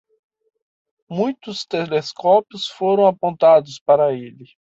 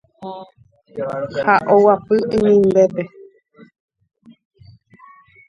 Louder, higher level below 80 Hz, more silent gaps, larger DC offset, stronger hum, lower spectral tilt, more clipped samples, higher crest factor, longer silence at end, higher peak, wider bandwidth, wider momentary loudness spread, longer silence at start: about the same, -18 LUFS vs -16 LUFS; second, -68 dBFS vs -54 dBFS; first, 3.81-3.86 s vs none; neither; neither; second, -5.5 dB/octave vs -7.5 dB/octave; neither; about the same, 16 dB vs 18 dB; second, 0.35 s vs 2.4 s; second, -4 dBFS vs 0 dBFS; about the same, 7.8 kHz vs 7.4 kHz; second, 14 LU vs 20 LU; first, 1.1 s vs 0.2 s